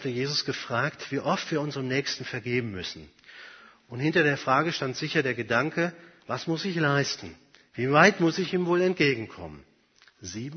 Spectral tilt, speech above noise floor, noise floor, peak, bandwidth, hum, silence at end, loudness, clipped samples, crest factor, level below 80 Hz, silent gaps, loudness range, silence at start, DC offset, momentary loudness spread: -5 dB/octave; 34 dB; -61 dBFS; -4 dBFS; 6.6 kHz; none; 0 s; -26 LUFS; under 0.1%; 24 dB; -64 dBFS; none; 5 LU; 0 s; under 0.1%; 20 LU